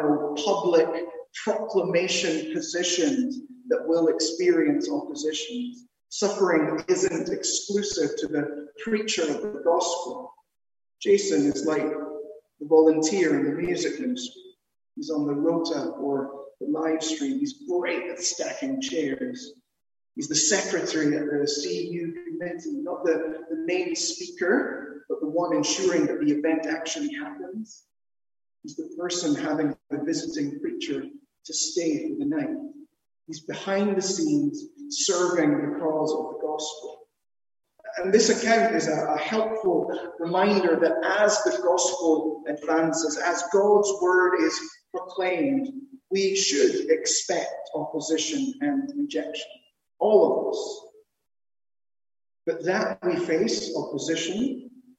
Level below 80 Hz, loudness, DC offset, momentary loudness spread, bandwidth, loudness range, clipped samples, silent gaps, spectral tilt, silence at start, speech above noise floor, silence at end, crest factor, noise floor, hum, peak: -70 dBFS; -25 LUFS; under 0.1%; 13 LU; 8.6 kHz; 6 LU; under 0.1%; none; -3.5 dB/octave; 0 s; over 65 dB; 0.2 s; 20 dB; under -90 dBFS; none; -6 dBFS